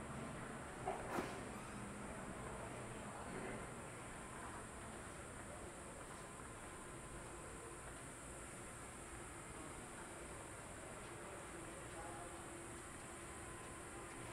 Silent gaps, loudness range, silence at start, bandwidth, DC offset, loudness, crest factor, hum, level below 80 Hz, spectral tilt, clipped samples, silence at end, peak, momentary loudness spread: none; 4 LU; 0 s; 15.5 kHz; under 0.1%; -51 LUFS; 22 dB; none; -64 dBFS; -4 dB/octave; under 0.1%; 0 s; -30 dBFS; 4 LU